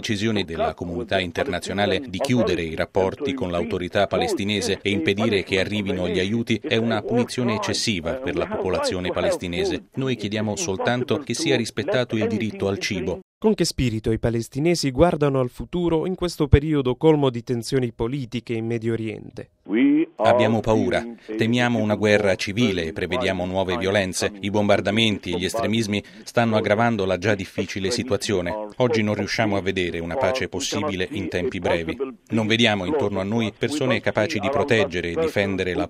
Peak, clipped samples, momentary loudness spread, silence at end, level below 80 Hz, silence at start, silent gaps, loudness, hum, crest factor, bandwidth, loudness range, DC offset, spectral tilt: 0 dBFS; under 0.1%; 7 LU; 0 s; -42 dBFS; 0 s; 13.22-13.41 s; -22 LUFS; none; 22 dB; 15 kHz; 3 LU; under 0.1%; -5 dB/octave